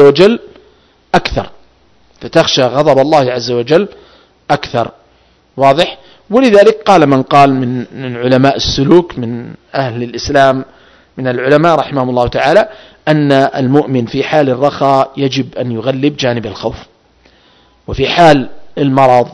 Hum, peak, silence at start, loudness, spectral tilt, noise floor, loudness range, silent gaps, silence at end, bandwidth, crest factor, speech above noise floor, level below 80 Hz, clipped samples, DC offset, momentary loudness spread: none; 0 dBFS; 0 s; -11 LUFS; -6 dB/octave; -49 dBFS; 4 LU; none; 0 s; 11 kHz; 12 dB; 39 dB; -38 dBFS; 2%; under 0.1%; 13 LU